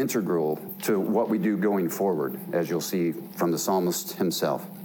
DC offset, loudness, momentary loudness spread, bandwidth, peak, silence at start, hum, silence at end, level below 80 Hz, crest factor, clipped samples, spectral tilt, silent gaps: under 0.1%; -26 LUFS; 5 LU; 18 kHz; -14 dBFS; 0 s; none; 0 s; -74 dBFS; 12 dB; under 0.1%; -5 dB/octave; none